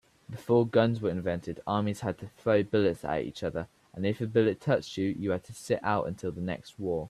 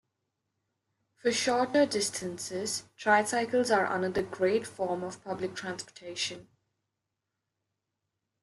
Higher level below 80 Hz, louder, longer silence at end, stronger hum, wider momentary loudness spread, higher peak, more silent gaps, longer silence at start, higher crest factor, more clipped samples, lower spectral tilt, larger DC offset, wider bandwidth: first, -60 dBFS vs -70 dBFS; about the same, -30 LUFS vs -30 LUFS; second, 0 s vs 2 s; neither; about the same, 10 LU vs 11 LU; about the same, -12 dBFS vs -10 dBFS; neither; second, 0.3 s vs 1.25 s; about the same, 18 dB vs 20 dB; neither; first, -7 dB/octave vs -3 dB/octave; neither; about the same, 13.5 kHz vs 12.5 kHz